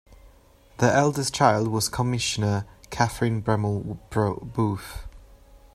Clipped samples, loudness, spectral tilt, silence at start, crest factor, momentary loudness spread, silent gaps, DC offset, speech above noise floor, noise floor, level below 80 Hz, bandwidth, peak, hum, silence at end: under 0.1%; -24 LUFS; -5 dB/octave; 0.1 s; 22 dB; 10 LU; none; under 0.1%; 30 dB; -54 dBFS; -48 dBFS; 15.5 kHz; -4 dBFS; none; 0.15 s